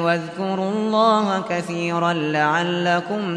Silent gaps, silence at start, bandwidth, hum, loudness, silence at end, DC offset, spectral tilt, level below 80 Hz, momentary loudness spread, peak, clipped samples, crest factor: none; 0 s; 11 kHz; none; -20 LUFS; 0 s; under 0.1%; -5.5 dB/octave; -68 dBFS; 7 LU; -4 dBFS; under 0.1%; 16 dB